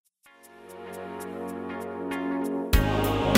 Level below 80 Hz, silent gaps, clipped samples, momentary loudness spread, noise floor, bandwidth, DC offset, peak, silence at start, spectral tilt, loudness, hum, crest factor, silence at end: -34 dBFS; none; under 0.1%; 17 LU; -55 dBFS; 16 kHz; under 0.1%; -6 dBFS; 0.45 s; -5.5 dB/octave; -29 LUFS; none; 22 dB; 0 s